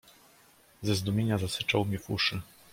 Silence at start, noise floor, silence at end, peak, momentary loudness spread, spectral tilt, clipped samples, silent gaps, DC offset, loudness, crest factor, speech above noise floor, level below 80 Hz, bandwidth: 0.8 s; -60 dBFS; 0.3 s; -12 dBFS; 5 LU; -5 dB/octave; under 0.1%; none; under 0.1%; -30 LUFS; 20 dB; 31 dB; -60 dBFS; 16.5 kHz